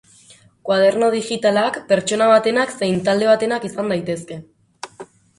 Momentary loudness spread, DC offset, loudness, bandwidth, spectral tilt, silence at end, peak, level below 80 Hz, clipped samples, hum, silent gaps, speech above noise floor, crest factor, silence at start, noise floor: 21 LU; under 0.1%; -18 LUFS; 11.5 kHz; -4.5 dB/octave; 0.35 s; -2 dBFS; -60 dBFS; under 0.1%; none; none; 32 dB; 18 dB; 0.65 s; -49 dBFS